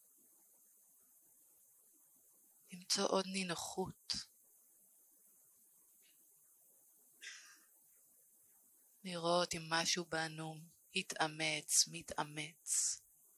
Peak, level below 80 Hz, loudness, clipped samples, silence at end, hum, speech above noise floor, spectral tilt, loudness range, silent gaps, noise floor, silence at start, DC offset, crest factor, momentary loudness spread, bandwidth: -18 dBFS; -78 dBFS; -38 LUFS; under 0.1%; 0.4 s; none; 30 dB; -2 dB/octave; 22 LU; none; -69 dBFS; 2.7 s; under 0.1%; 26 dB; 20 LU; 16 kHz